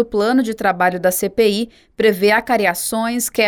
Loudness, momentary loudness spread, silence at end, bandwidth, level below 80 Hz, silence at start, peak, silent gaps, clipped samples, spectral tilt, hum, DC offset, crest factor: -17 LUFS; 5 LU; 0 s; over 20 kHz; -50 dBFS; 0 s; -4 dBFS; none; under 0.1%; -3.5 dB/octave; none; under 0.1%; 14 dB